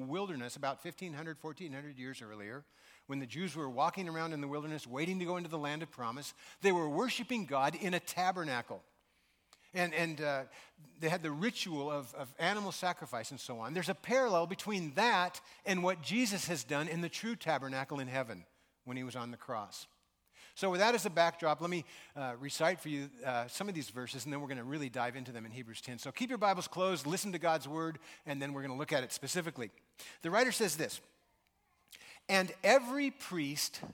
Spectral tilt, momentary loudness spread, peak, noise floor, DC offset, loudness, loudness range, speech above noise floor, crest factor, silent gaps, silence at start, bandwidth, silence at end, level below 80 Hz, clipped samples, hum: -4 dB/octave; 15 LU; -12 dBFS; -76 dBFS; under 0.1%; -36 LUFS; 6 LU; 39 dB; 26 dB; none; 0 s; 19 kHz; 0 s; -80 dBFS; under 0.1%; none